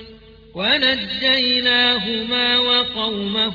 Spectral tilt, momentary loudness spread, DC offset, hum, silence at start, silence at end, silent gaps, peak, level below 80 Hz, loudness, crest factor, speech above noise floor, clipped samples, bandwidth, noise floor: -4.5 dB/octave; 7 LU; under 0.1%; none; 0 s; 0 s; none; -4 dBFS; -50 dBFS; -16 LUFS; 16 dB; 24 dB; under 0.1%; 5.4 kHz; -43 dBFS